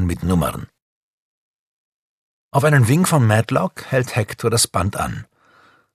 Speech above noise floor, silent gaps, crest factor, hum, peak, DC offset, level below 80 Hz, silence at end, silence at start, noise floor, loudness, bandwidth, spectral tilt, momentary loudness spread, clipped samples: 36 dB; 0.82-2.51 s; 18 dB; none; 0 dBFS; under 0.1%; -42 dBFS; 0.7 s; 0 s; -54 dBFS; -18 LUFS; 14 kHz; -5 dB/octave; 10 LU; under 0.1%